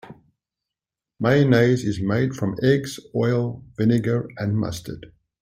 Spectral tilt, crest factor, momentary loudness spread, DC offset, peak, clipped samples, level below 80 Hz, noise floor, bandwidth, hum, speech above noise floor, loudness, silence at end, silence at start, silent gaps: -7 dB/octave; 18 dB; 12 LU; under 0.1%; -4 dBFS; under 0.1%; -54 dBFS; -88 dBFS; 15.5 kHz; none; 67 dB; -22 LUFS; 0.35 s; 0.05 s; none